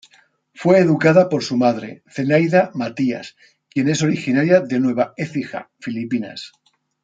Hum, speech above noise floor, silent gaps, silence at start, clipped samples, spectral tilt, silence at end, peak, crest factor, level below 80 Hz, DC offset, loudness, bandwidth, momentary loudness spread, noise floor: none; 38 dB; none; 0.6 s; under 0.1%; -6.5 dB/octave; 0.55 s; -2 dBFS; 16 dB; -64 dBFS; under 0.1%; -18 LUFS; 9 kHz; 16 LU; -56 dBFS